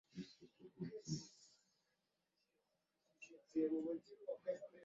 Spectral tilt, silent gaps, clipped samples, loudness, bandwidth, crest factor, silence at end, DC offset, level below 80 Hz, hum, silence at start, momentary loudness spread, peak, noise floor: -7 dB/octave; none; under 0.1%; -47 LUFS; 7.8 kHz; 20 dB; 0 s; under 0.1%; -84 dBFS; none; 0.15 s; 21 LU; -30 dBFS; -87 dBFS